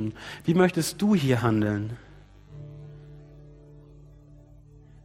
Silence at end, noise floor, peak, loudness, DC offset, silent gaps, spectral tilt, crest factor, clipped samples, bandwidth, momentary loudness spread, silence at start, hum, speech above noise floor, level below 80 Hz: 1.5 s; -51 dBFS; -6 dBFS; -25 LUFS; under 0.1%; none; -6 dB/octave; 22 dB; under 0.1%; 16 kHz; 23 LU; 0 s; none; 27 dB; -54 dBFS